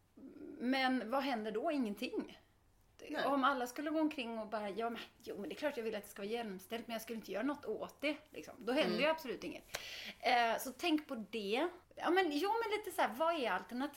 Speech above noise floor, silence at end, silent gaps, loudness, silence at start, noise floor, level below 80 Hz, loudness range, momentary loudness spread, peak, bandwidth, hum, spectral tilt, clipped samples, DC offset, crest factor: 32 dB; 0 s; none; -38 LUFS; 0.15 s; -70 dBFS; -74 dBFS; 6 LU; 12 LU; -20 dBFS; 16.5 kHz; none; -4 dB/octave; under 0.1%; under 0.1%; 20 dB